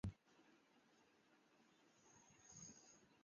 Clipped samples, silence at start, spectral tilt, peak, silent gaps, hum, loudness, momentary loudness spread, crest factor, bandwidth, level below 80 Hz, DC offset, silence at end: under 0.1%; 0.05 s; -6.5 dB/octave; -36 dBFS; none; none; -61 LUFS; 12 LU; 26 dB; 7.2 kHz; -70 dBFS; under 0.1%; 0 s